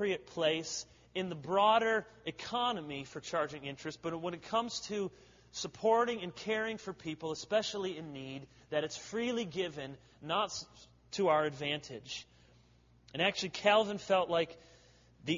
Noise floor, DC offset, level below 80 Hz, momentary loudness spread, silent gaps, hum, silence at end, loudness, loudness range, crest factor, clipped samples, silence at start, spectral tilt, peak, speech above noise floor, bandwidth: -65 dBFS; under 0.1%; -70 dBFS; 14 LU; none; none; 0 s; -35 LUFS; 4 LU; 22 dB; under 0.1%; 0 s; -2.5 dB/octave; -14 dBFS; 30 dB; 7.4 kHz